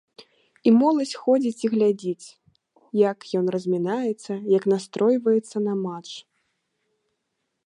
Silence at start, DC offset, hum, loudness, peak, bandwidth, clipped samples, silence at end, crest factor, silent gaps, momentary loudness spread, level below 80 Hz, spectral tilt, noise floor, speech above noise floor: 0.2 s; under 0.1%; none; -23 LUFS; -8 dBFS; 11 kHz; under 0.1%; 1.45 s; 16 dB; none; 12 LU; -78 dBFS; -6.5 dB/octave; -78 dBFS; 56 dB